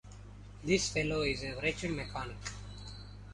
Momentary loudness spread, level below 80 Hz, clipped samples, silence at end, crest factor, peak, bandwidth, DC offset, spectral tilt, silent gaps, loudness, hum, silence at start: 19 LU; -50 dBFS; under 0.1%; 0 s; 22 dB; -14 dBFS; 11.5 kHz; under 0.1%; -4 dB/octave; none; -34 LUFS; 50 Hz at -45 dBFS; 0.05 s